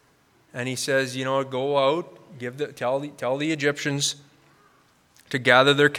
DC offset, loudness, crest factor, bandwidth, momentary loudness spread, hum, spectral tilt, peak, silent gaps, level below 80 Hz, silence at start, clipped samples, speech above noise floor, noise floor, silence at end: under 0.1%; -23 LUFS; 24 dB; 16.5 kHz; 17 LU; none; -3.5 dB/octave; -2 dBFS; none; -74 dBFS; 0.55 s; under 0.1%; 37 dB; -61 dBFS; 0 s